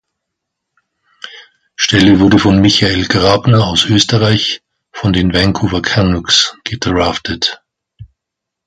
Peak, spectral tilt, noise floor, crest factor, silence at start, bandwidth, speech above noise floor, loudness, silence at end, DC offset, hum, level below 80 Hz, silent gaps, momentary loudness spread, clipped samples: 0 dBFS; -4.5 dB/octave; -79 dBFS; 14 dB; 1.25 s; 10.5 kHz; 68 dB; -11 LUFS; 0.6 s; under 0.1%; none; -32 dBFS; none; 14 LU; under 0.1%